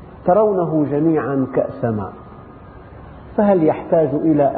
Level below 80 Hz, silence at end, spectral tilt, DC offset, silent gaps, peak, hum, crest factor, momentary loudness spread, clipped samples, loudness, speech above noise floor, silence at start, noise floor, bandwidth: -46 dBFS; 0 s; -9.5 dB/octave; under 0.1%; none; -4 dBFS; none; 14 dB; 10 LU; under 0.1%; -17 LUFS; 23 dB; 0 s; -39 dBFS; 4.1 kHz